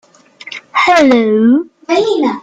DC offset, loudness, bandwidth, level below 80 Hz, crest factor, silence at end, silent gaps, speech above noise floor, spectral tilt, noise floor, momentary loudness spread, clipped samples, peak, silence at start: under 0.1%; -11 LUFS; 9.2 kHz; -54 dBFS; 12 dB; 0 s; none; 24 dB; -5 dB/octave; -34 dBFS; 12 LU; under 0.1%; 0 dBFS; 0.45 s